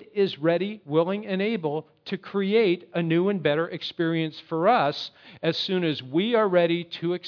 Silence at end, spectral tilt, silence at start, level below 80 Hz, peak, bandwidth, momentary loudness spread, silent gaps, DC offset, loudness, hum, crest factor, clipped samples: 0 s; -7.5 dB/octave; 0 s; -78 dBFS; -8 dBFS; 5.4 kHz; 9 LU; none; under 0.1%; -25 LUFS; none; 18 dB; under 0.1%